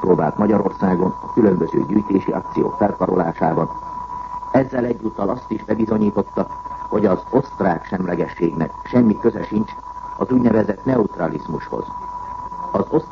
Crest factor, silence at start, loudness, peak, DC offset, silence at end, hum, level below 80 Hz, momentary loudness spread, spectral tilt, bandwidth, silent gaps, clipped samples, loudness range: 18 dB; 0 s; -20 LUFS; -2 dBFS; under 0.1%; 0 s; none; -44 dBFS; 12 LU; -9.5 dB/octave; 7 kHz; none; under 0.1%; 3 LU